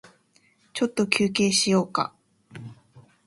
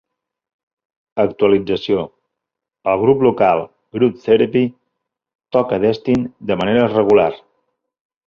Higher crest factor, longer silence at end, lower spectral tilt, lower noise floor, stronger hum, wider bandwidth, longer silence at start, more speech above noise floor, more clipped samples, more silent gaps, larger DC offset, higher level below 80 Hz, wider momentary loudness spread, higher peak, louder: first, 24 dB vs 16 dB; second, 0.25 s vs 0.9 s; second, -3.5 dB/octave vs -8 dB/octave; second, -63 dBFS vs -83 dBFS; neither; first, 11.5 kHz vs 6.8 kHz; second, 0.75 s vs 1.15 s; second, 40 dB vs 67 dB; neither; second, none vs 5.35-5.39 s; neither; second, -66 dBFS vs -52 dBFS; first, 22 LU vs 9 LU; about the same, -2 dBFS vs -2 dBFS; second, -23 LUFS vs -16 LUFS